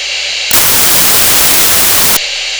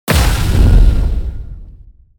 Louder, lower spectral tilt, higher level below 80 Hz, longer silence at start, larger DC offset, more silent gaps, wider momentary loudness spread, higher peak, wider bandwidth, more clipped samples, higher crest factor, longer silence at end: first, -5 LUFS vs -14 LUFS; second, 0 dB/octave vs -5.5 dB/octave; second, -34 dBFS vs -12 dBFS; about the same, 0 s vs 0.05 s; neither; neither; second, 6 LU vs 18 LU; about the same, 0 dBFS vs 0 dBFS; about the same, over 20 kHz vs 19.5 kHz; neither; about the same, 8 dB vs 12 dB; second, 0 s vs 0.4 s